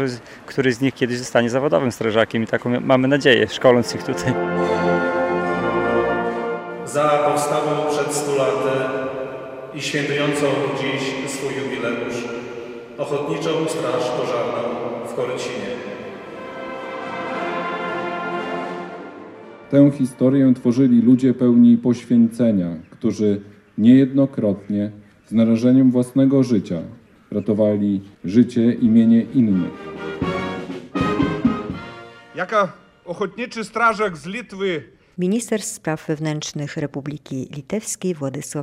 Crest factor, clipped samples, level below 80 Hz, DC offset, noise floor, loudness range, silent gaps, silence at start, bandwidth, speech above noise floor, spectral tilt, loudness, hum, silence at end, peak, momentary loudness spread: 18 dB; under 0.1%; -56 dBFS; under 0.1%; -39 dBFS; 9 LU; none; 0 s; 14.5 kHz; 21 dB; -6 dB/octave; -20 LUFS; none; 0 s; 0 dBFS; 15 LU